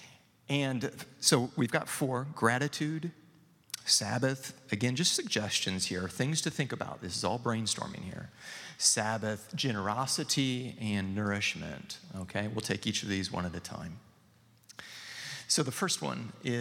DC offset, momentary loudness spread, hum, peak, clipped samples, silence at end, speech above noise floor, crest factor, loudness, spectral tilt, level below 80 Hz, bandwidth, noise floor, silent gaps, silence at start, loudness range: under 0.1%; 16 LU; none; -10 dBFS; under 0.1%; 0 s; 31 dB; 24 dB; -32 LUFS; -3.5 dB/octave; -70 dBFS; 17.5 kHz; -63 dBFS; none; 0 s; 5 LU